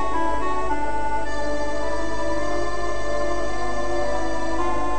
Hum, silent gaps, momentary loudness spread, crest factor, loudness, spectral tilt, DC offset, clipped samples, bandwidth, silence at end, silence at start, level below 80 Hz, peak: 50 Hz at -35 dBFS; none; 2 LU; 12 dB; -26 LUFS; -5 dB/octave; 10%; under 0.1%; 10.5 kHz; 0 s; 0 s; -36 dBFS; -10 dBFS